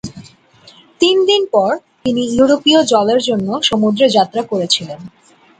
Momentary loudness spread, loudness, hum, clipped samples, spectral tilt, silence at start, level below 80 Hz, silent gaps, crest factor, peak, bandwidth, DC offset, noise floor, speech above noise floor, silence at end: 8 LU; -14 LUFS; none; under 0.1%; -4 dB/octave; 0.05 s; -52 dBFS; none; 14 dB; 0 dBFS; 9.6 kHz; under 0.1%; -45 dBFS; 32 dB; 0.5 s